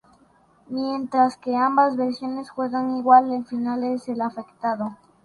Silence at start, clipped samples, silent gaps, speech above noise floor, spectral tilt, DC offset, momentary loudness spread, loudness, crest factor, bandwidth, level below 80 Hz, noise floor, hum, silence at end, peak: 0.7 s; under 0.1%; none; 36 dB; -6 dB/octave; under 0.1%; 13 LU; -23 LUFS; 20 dB; 11 kHz; -68 dBFS; -58 dBFS; none; 0.3 s; -2 dBFS